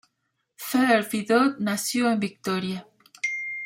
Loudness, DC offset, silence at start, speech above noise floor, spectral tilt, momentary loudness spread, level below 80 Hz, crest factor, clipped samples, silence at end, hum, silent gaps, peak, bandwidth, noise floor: -24 LUFS; under 0.1%; 0.6 s; 53 dB; -4 dB/octave; 10 LU; -72 dBFS; 18 dB; under 0.1%; 0 s; none; none; -8 dBFS; 16.5 kHz; -77 dBFS